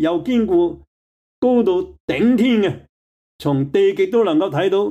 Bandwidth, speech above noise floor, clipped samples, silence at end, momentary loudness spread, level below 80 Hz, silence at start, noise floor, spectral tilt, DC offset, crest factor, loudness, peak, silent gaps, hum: 12.5 kHz; over 73 dB; under 0.1%; 0 s; 7 LU; -52 dBFS; 0 s; under -90 dBFS; -7.5 dB/octave; under 0.1%; 12 dB; -18 LUFS; -6 dBFS; 0.87-1.42 s, 2.00-2.08 s, 2.89-3.39 s; none